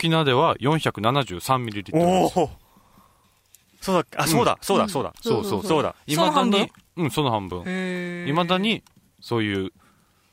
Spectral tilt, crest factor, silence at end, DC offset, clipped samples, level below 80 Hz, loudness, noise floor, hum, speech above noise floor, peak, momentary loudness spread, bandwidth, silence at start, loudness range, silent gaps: -5 dB/octave; 18 dB; 0.65 s; under 0.1%; under 0.1%; -54 dBFS; -23 LUFS; -60 dBFS; none; 38 dB; -6 dBFS; 9 LU; 16 kHz; 0 s; 3 LU; none